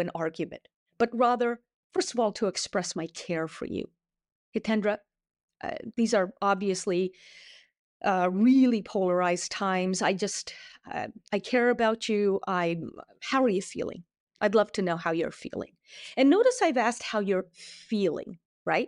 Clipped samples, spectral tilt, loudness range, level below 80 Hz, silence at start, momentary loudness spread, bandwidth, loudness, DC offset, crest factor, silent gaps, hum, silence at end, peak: under 0.1%; -4.5 dB/octave; 5 LU; -68 dBFS; 0 s; 14 LU; 11 kHz; -28 LUFS; under 0.1%; 16 dB; 0.76-0.86 s, 1.74-1.90 s, 4.32-4.52 s, 5.43-5.48 s, 7.79-8.00 s, 14.20-14.27 s, 18.45-18.65 s; none; 0 s; -12 dBFS